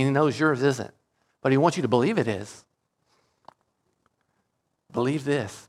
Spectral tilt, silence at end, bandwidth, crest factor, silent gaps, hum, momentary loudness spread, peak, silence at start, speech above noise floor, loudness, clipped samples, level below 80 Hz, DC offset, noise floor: -6.5 dB/octave; 0.05 s; 13 kHz; 20 dB; none; none; 12 LU; -6 dBFS; 0 s; 52 dB; -24 LUFS; under 0.1%; -70 dBFS; under 0.1%; -76 dBFS